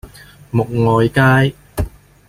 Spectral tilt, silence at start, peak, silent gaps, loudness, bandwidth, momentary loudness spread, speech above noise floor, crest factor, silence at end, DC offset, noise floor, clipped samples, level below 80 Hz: -7 dB/octave; 0.05 s; -2 dBFS; none; -15 LUFS; 15.5 kHz; 13 LU; 26 dB; 14 dB; 0.4 s; under 0.1%; -39 dBFS; under 0.1%; -34 dBFS